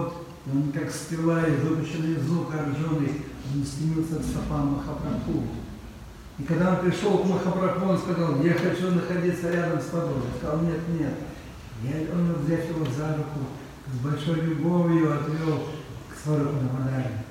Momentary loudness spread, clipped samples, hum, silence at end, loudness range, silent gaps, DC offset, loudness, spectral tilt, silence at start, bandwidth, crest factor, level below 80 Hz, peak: 12 LU; under 0.1%; none; 0 s; 4 LU; none; under 0.1%; -26 LUFS; -7.5 dB/octave; 0 s; 15 kHz; 16 dB; -46 dBFS; -10 dBFS